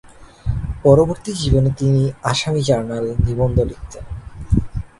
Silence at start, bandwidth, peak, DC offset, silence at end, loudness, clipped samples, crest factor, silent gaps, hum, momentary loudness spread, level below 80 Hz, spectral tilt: 0.2 s; 11.5 kHz; 0 dBFS; under 0.1%; 0.15 s; -18 LUFS; under 0.1%; 18 dB; none; none; 17 LU; -28 dBFS; -6.5 dB/octave